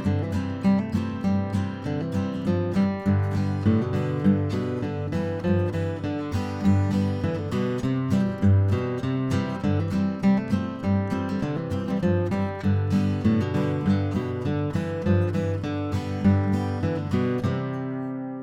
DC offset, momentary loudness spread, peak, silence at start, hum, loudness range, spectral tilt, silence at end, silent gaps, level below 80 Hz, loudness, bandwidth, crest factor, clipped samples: under 0.1%; 6 LU; -10 dBFS; 0 s; none; 1 LU; -8.5 dB/octave; 0 s; none; -50 dBFS; -25 LUFS; 8.4 kHz; 14 dB; under 0.1%